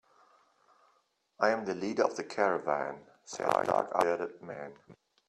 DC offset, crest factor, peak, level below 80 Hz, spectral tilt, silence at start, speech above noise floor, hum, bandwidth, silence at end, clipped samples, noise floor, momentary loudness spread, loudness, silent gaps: under 0.1%; 24 dB; -10 dBFS; -74 dBFS; -4.5 dB/octave; 1.4 s; 42 dB; none; 13 kHz; 0.35 s; under 0.1%; -73 dBFS; 15 LU; -31 LUFS; none